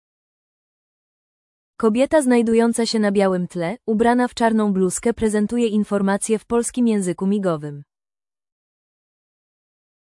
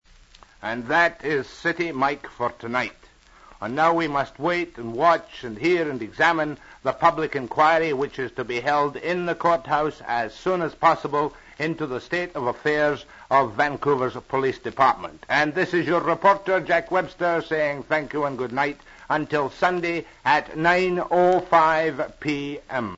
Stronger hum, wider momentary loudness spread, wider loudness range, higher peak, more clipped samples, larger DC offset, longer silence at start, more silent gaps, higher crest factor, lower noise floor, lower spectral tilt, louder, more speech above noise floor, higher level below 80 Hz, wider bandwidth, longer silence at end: neither; second, 7 LU vs 10 LU; first, 6 LU vs 3 LU; about the same, -6 dBFS vs -4 dBFS; neither; neither; first, 1.8 s vs 0.65 s; neither; about the same, 16 dB vs 18 dB; first, under -90 dBFS vs -51 dBFS; about the same, -5.5 dB/octave vs -5.5 dB/octave; first, -19 LUFS vs -23 LUFS; first, over 71 dB vs 28 dB; about the same, -52 dBFS vs -54 dBFS; first, 12 kHz vs 8 kHz; first, 2.2 s vs 0 s